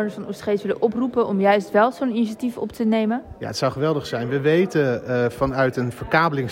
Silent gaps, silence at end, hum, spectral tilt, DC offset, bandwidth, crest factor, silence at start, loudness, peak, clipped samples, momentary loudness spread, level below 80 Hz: none; 0 s; none; -6.5 dB/octave; under 0.1%; 16 kHz; 16 dB; 0 s; -21 LUFS; -6 dBFS; under 0.1%; 8 LU; -50 dBFS